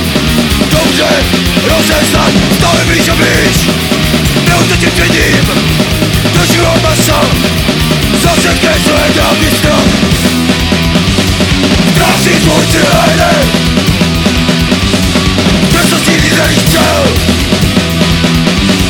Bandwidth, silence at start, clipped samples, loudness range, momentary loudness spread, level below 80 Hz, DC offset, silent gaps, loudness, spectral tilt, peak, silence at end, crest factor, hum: 19.5 kHz; 0 s; under 0.1%; 1 LU; 2 LU; -20 dBFS; 0.3%; none; -8 LUFS; -4 dB/octave; 0 dBFS; 0 s; 8 dB; none